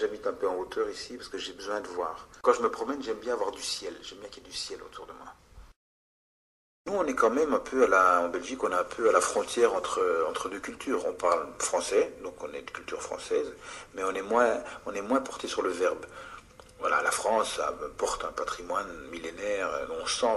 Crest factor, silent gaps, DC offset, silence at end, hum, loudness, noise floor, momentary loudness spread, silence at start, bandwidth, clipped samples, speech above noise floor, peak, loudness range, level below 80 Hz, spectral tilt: 22 dB; 5.76-6.85 s; under 0.1%; 0 s; none; -29 LUFS; -49 dBFS; 14 LU; 0 s; 12.5 kHz; under 0.1%; 20 dB; -8 dBFS; 8 LU; -60 dBFS; -2.5 dB/octave